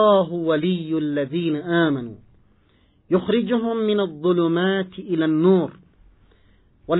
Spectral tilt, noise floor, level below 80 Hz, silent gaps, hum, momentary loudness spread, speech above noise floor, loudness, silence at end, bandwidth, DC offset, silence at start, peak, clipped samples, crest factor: -11 dB/octave; -59 dBFS; -60 dBFS; none; none; 6 LU; 39 dB; -21 LUFS; 0 s; 4.1 kHz; under 0.1%; 0 s; -6 dBFS; under 0.1%; 16 dB